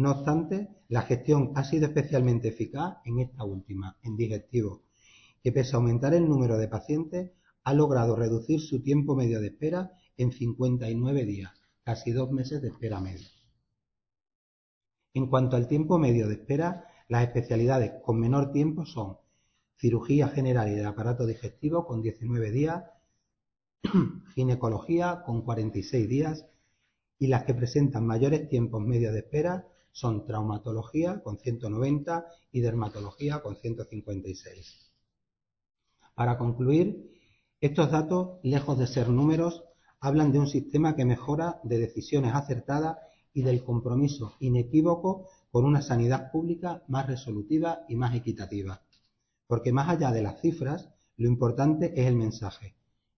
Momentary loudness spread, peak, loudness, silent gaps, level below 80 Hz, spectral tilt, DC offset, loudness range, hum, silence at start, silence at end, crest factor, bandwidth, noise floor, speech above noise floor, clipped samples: 12 LU; -10 dBFS; -28 LUFS; 14.35-14.81 s; -52 dBFS; -8.5 dB/octave; under 0.1%; 5 LU; none; 0 s; 0.5 s; 18 dB; 6.4 kHz; -88 dBFS; 60 dB; under 0.1%